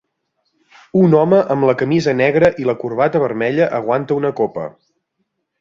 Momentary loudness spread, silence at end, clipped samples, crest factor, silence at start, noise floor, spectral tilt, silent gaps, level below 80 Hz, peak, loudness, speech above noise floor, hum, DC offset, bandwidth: 8 LU; 0.9 s; under 0.1%; 16 dB; 0.95 s; -71 dBFS; -8 dB/octave; none; -54 dBFS; -2 dBFS; -16 LUFS; 56 dB; none; under 0.1%; 7.6 kHz